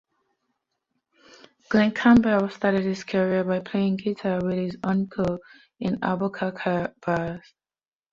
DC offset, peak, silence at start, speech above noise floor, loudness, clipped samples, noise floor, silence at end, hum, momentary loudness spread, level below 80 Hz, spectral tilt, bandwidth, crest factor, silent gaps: under 0.1%; -4 dBFS; 1.7 s; over 66 dB; -24 LUFS; under 0.1%; under -90 dBFS; 0.75 s; none; 10 LU; -56 dBFS; -7.5 dB/octave; 7.4 kHz; 20 dB; none